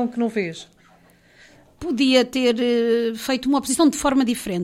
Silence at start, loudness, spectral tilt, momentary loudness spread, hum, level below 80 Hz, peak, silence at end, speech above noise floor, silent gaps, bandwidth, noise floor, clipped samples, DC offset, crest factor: 0 s; -20 LUFS; -4 dB/octave; 10 LU; none; -52 dBFS; -4 dBFS; 0 s; 34 dB; none; 16 kHz; -54 dBFS; under 0.1%; under 0.1%; 18 dB